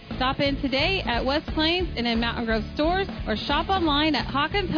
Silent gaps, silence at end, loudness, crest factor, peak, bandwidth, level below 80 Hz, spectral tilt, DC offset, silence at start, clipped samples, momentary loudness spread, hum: none; 0 s; -24 LUFS; 14 dB; -12 dBFS; 5.4 kHz; -36 dBFS; -6.5 dB/octave; under 0.1%; 0 s; under 0.1%; 4 LU; none